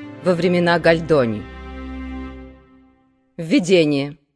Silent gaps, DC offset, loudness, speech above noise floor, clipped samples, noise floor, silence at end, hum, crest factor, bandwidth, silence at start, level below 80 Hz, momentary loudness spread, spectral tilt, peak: none; under 0.1%; -17 LUFS; 41 dB; under 0.1%; -58 dBFS; 0.2 s; none; 18 dB; 11 kHz; 0 s; -42 dBFS; 18 LU; -6 dB/octave; -2 dBFS